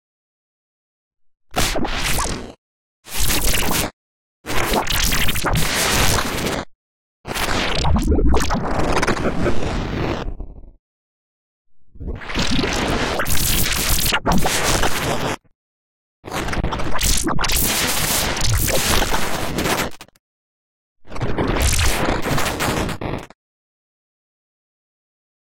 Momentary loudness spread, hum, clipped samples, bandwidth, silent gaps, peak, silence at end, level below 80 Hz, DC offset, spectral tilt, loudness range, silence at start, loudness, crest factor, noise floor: 11 LU; none; under 0.1%; 17.5 kHz; 2.58-3.03 s, 3.93-4.44 s, 6.75-7.24 s, 10.79-11.65 s, 15.55-16.23 s, 20.19-20.96 s; -2 dBFS; 2.2 s; -28 dBFS; under 0.1%; -3 dB/octave; 6 LU; 1.5 s; -20 LUFS; 16 dB; under -90 dBFS